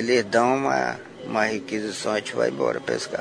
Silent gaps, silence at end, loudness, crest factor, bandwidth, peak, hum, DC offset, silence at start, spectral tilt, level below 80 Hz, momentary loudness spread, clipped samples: none; 0 s; -24 LUFS; 18 dB; 11 kHz; -6 dBFS; none; under 0.1%; 0 s; -4 dB/octave; -64 dBFS; 8 LU; under 0.1%